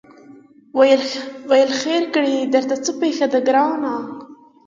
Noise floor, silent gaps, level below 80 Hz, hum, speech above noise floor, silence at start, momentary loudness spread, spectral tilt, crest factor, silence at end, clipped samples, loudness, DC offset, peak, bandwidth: -45 dBFS; none; -70 dBFS; none; 28 dB; 0.3 s; 12 LU; -3 dB/octave; 18 dB; 0.35 s; under 0.1%; -18 LUFS; under 0.1%; -2 dBFS; 7.6 kHz